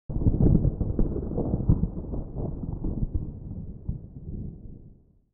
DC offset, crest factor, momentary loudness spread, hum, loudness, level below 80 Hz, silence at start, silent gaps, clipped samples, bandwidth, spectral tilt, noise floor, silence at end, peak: under 0.1%; 18 dB; 17 LU; none; -29 LUFS; -32 dBFS; 0.1 s; none; under 0.1%; 1.7 kHz; -16.5 dB/octave; -53 dBFS; 0.4 s; -10 dBFS